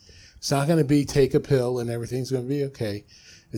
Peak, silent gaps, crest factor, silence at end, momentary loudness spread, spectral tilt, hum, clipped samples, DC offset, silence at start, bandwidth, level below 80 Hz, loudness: -8 dBFS; none; 16 dB; 0 s; 11 LU; -6.5 dB/octave; none; under 0.1%; under 0.1%; 0.4 s; 17 kHz; -48 dBFS; -24 LUFS